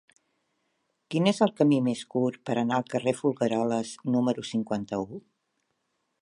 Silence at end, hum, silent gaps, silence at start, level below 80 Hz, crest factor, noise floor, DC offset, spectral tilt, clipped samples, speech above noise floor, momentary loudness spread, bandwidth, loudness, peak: 1 s; none; none; 1.1 s; -70 dBFS; 20 dB; -77 dBFS; under 0.1%; -6 dB/octave; under 0.1%; 51 dB; 9 LU; 11 kHz; -27 LUFS; -8 dBFS